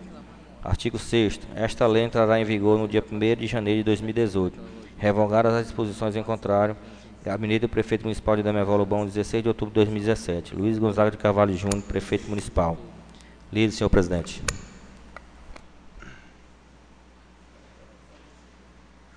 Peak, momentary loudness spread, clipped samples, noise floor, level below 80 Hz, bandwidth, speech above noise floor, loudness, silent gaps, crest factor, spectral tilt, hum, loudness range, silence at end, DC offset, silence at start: -4 dBFS; 10 LU; under 0.1%; -52 dBFS; -40 dBFS; 10.5 kHz; 29 dB; -24 LUFS; none; 20 dB; -6 dB/octave; none; 5 LU; 3 s; under 0.1%; 0 s